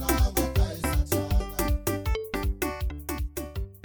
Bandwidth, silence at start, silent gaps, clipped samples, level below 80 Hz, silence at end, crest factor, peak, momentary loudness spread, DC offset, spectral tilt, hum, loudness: over 20 kHz; 0 s; none; under 0.1%; -30 dBFS; 0.05 s; 18 dB; -10 dBFS; 9 LU; under 0.1%; -5 dB/octave; none; -29 LUFS